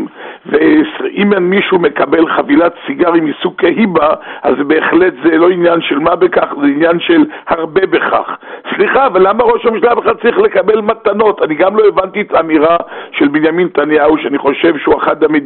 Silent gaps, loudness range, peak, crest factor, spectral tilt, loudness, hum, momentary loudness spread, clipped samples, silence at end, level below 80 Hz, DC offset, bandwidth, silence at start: none; 1 LU; -2 dBFS; 10 dB; -3.5 dB/octave; -11 LUFS; none; 5 LU; under 0.1%; 0 s; -46 dBFS; under 0.1%; 4.2 kHz; 0 s